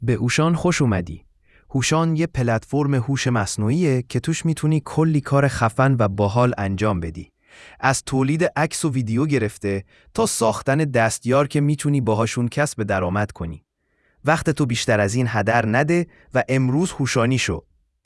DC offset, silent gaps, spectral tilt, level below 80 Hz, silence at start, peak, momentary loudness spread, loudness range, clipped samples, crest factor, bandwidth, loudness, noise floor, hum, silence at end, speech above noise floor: under 0.1%; none; -5.5 dB/octave; -48 dBFS; 0 s; -2 dBFS; 7 LU; 2 LU; under 0.1%; 18 dB; 12 kHz; -20 LUFS; -65 dBFS; none; 0.45 s; 45 dB